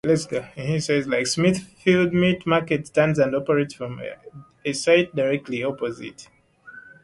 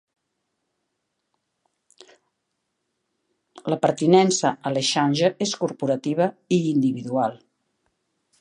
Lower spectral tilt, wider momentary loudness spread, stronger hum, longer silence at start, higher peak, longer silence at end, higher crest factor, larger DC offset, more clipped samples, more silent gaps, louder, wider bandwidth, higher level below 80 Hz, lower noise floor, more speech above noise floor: about the same, -5.5 dB/octave vs -5 dB/octave; first, 13 LU vs 8 LU; neither; second, 0.05 s vs 3.65 s; about the same, -4 dBFS vs -4 dBFS; second, 0.15 s vs 1.05 s; about the same, 18 dB vs 20 dB; neither; neither; neither; about the same, -22 LUFS vs -22 LUFS; about the same, 11.5 kHz vs 11 kHz; first, -56 dBFS vs -72 dBFS; second, -46 dBFS vs -78 dBFS; second, 24 dB vs 56 dB